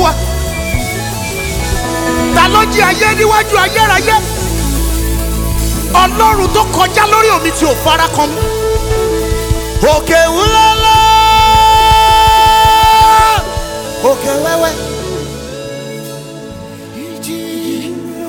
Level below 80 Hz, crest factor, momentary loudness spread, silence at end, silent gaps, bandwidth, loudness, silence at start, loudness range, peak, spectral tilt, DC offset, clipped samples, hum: -22 dBFS; 10 dB; 16 LU; 0 s; none; over 20 kHz; -10 LUFS; 0 s; 10 LU; 0 dBFS; -3.5 dB/octave; under 0.1%; 0.2%; none